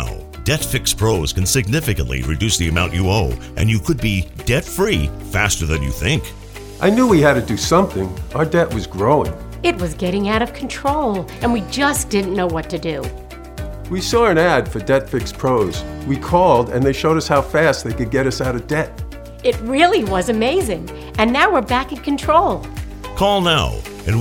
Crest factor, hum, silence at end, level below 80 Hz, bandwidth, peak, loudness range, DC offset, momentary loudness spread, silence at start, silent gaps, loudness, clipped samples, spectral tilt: 18 dB; none; 0 s; -32 dBFS; 19 kHz; 0 dBFS; 3 LU; under 0.1%; 11 LU; 0 s; none; -17 LUFS; under 0.1%; -5 dB/octave